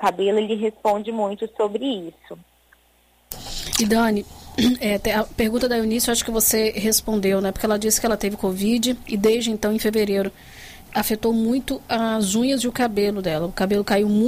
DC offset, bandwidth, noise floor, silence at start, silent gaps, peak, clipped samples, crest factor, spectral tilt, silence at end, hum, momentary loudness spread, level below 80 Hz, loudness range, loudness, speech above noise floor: under 0.1%; 16 kHz; -59 dBFS; 0 s; none; -6 dBFS; under 0.1%; 16 dB; -3.5 dB/octave; 0 s; none; 8 LU; -42 dBFS; 5 LU; -21 LUFS; 38 dB